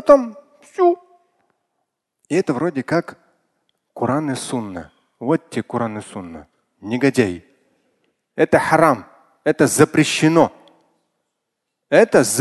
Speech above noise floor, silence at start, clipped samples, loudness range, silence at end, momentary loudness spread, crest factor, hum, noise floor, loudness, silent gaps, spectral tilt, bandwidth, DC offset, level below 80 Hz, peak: 61 dB; 0.05 s; under 0.1%; 8 LU; 0 s; 19 LU; 20 dB; none; -78 dBFS; -18 LUFS; none; -5 dB/octave; 12.5 kHz; under 0.1%; -56 dBFS; 0 dBFS